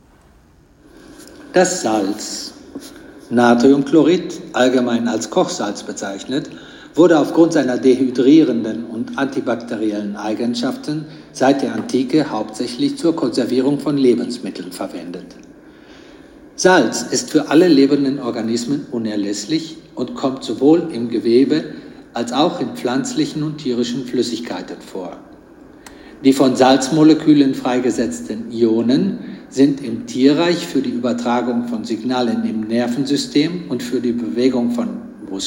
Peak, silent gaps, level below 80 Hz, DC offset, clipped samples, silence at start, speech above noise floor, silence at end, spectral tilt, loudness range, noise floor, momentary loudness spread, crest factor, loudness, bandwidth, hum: 0 dBFS; none; -56 dBFS; under 0.1%; under 0.1%; 1.1 s; 33 dB; 0 s; -5 dB/octave; 5 LU; -49 dBFS; 15 LU; 16 dB; -17 LUFS; 16.5 kHz; none